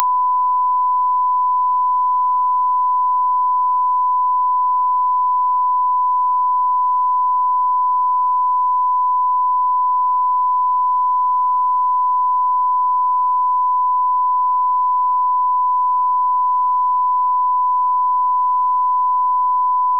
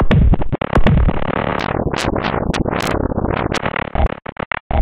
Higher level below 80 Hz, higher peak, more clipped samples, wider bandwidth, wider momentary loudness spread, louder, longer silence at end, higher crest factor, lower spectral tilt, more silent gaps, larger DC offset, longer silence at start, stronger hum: second, under -90 dBFS vs -20 dBFS; about the same, 0 dBFS vs -2 dBFS; neither; second, 1.1 kHz vs 13.5 kHz; second, 0 LU vs 7 LU; about the same, -16 LUFS vs -18 LUFS; about the same, 0 s vs 0 s; about the same, 14 dB vs 14 dB; about the same, -5.5 dB/octave vs -6.5 dB/octave; second, none vs 4.32-4.36 s, 4.46-4.51 s, 4.60-4.70 s; first, 0.8% vs under 0.1%; about the same, 0 s vs 0 s; neither